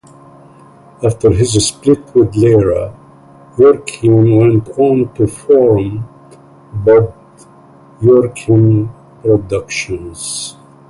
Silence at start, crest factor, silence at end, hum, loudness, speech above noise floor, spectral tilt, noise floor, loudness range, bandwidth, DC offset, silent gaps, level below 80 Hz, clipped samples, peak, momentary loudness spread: 1 s; 12 dB; 0.4 s; none; -12 LUFS; 30 dB; -6.5 dB/octave; -41 dBFS; 3 LU; 11.5 kHz; under 0.1%; none; -38 dBFS; under 0.1%; 0 dBFS; 13 LU